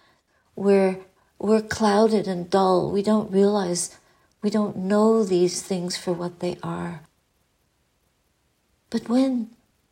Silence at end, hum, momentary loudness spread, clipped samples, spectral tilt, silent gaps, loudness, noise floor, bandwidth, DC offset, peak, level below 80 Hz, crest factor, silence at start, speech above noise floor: 0.45 s; none; 12 LU; under 0.1%; -5.5 dB/octave; none; -23 LUFS; -68 dBFS; 16 kHz; under 0.1%; -6 dBFS; -62 dBFS; 16 dB; 0.55 s; 47 dB